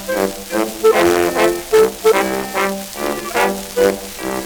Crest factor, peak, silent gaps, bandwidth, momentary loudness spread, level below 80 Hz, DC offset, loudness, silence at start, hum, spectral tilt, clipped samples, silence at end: 16 dB; 0 dBFS; none; over 20 kHz; 9 LU; -44 dBFS; under 0.1%; -16 LUFS; 0 s; none; -3.5 dB/octave; under 0.1%; 0 s